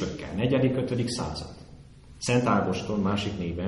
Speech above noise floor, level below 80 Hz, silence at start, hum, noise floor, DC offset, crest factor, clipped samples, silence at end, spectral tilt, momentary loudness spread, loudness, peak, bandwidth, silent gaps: 22 dB; -48 dBFS; 0 s; none; -48 dBFS; under 0.1%; 18 dB; under 0.1%; 0 s; -6 dB/octave; 11 LU; -27 LUFS; -10 dBFS; 11.5 kHz; none